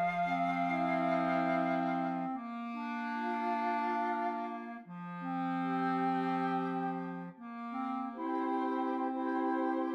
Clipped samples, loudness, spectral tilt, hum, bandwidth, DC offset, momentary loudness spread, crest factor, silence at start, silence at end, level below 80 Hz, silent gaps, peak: under 0.1%; -35 LUFS; -8 dB/octave; none; 7.4 kHz; under 0.1%; 10 LU; 14 dB; 0 s; 0 s; -76 dBFS; none; -20 dBFS